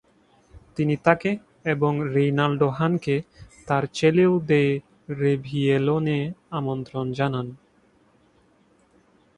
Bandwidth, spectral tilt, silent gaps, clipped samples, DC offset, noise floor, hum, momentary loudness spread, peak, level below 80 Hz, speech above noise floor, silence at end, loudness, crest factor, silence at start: 10 kHz; -7.5 dB/octave; none; under 0.1%; under 0.1%; -60 dBFS; none; 10 LU; -2 dBFS; -58 dBFS; 38 dB; 1.85 s; -23 LUFS; 22 dB; 0.55 s